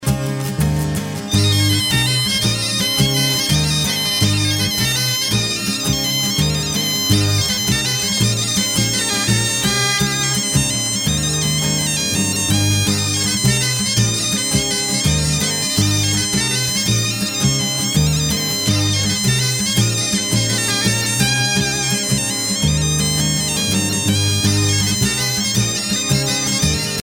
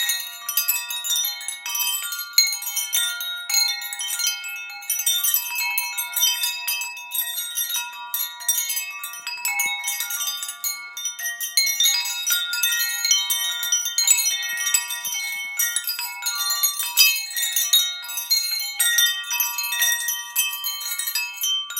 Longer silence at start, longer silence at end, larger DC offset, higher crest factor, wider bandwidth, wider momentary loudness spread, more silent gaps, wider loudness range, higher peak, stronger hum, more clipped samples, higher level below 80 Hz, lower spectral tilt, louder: about the same, 0 s vs 0 s; about the same, 0 s vs 0 s; neither; second, 16 dB vs 24 dB; about the same, 17.5 kHz vs 17.5 kHz; second, 2 LU vs 9 LU; neither; second, 1 LU vs 5 LU; about the same, -2 dBFS vs 0 dBFS; neither; neither; first, -36 dBFS vs under -90 dBFS; first, -3 dB/octave vs 6.5 dB/octave; first, -16 LUFS vs -21 LUFS